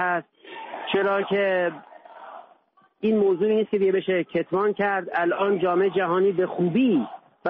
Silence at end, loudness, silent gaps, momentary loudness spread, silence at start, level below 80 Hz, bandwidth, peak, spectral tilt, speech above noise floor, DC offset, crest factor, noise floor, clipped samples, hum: 0 s; -23 LUFS; none; 15 LU; 0 s; -70 dBFS; 4 kHz; -12 dBFS; -4.5 dB/octave; 37 dB; under 0.1%; 12 dB; -59 dBFS; under 0.1%; none